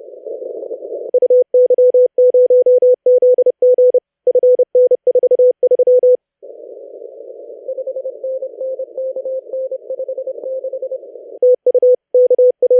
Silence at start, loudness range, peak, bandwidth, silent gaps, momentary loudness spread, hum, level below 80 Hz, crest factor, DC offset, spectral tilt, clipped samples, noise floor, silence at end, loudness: 0.1 s; 13 LU; -6 dBFS; 0.9 kHz; none; 18 LU; none; -86 dBFS; 8 dB; under 0.1%; -9 dB/octave; under 0.1%; -37 dBFS; 0 s; -13 LUFS